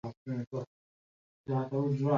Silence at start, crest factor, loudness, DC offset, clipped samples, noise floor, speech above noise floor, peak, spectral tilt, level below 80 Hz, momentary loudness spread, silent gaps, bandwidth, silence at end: 0.05 s; 18 dB; -35 LUFS; under 0.1%; under 0.1%; under -90 dBFS; over 59 dB; -16 dBFS; -10 dB/octave; -70 dBFS; 15 LU; 0.17-0.26 s, 0.47-0.51 s, 0.67-1.44 s; 7 kHz; 0 s